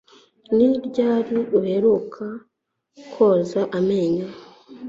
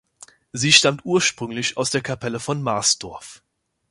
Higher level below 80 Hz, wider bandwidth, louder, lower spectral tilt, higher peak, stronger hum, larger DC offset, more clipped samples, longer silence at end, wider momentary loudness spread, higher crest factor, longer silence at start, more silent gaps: about the same, -62 dBFS vs -58 dBFS; second, 7.6 kHz vs 11.5 kHz; about the same, -20 LUFS vs -19 LUFS; first, -8 dB/octave vs -2.5 dB/octave; second, -6 dBFS vs 0 dBFS; neither; neither; neither; second, 0 s vs 0.55 s; about the same, 15 LU vs 14 LU; second, 16 dB vs 22 dB; about the same, 0.5 s vs 0.55 s; neither